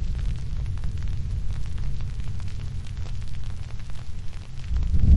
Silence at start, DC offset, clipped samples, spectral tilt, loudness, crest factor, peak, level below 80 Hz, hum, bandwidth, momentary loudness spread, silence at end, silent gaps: 0 s; under 0.1%; under 0.1%; -7 dB/octave; -33 LUFS; 18 dB; -6 dBFS; -28 dBFS; none; 10.5 kHz; 8 LU; 0 s; none